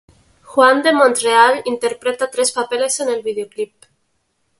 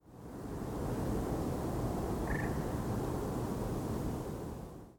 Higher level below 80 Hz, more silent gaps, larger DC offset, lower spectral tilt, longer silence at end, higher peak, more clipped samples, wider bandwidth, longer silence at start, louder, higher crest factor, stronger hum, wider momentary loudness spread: second, -64 dBFS vs -46 dBFS; neither; neither; second, -1 dB/octave vs -7 dB/octave; first, 0.95 s vs 0 s; first, 0 dBFS vs -24 dBFS; neither; second, 12 kHz vs 18 kHz; first, 0.5 s vs 0.05 s; first, -16 LUFS vs -38 LUFS; about the same, 18 dB vs 14 dB; neither; first, 12 LU vs 8 LU